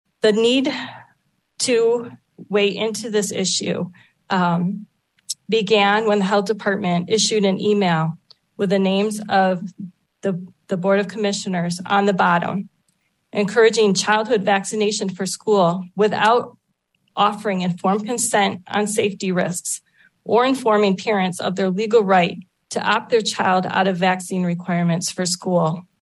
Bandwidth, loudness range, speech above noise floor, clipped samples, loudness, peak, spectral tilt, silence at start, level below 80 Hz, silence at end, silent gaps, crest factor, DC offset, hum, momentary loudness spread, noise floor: 12.5 kHz; 3 LU; 50 dB; under 0.1%; -19 LUFS; -4 dBFS; -4.5 dB/octave; 0.25 s; -70 dBFS; 0.2 s; none; 16 dB; under 0.1%; none; 11 LU; -69 dBFS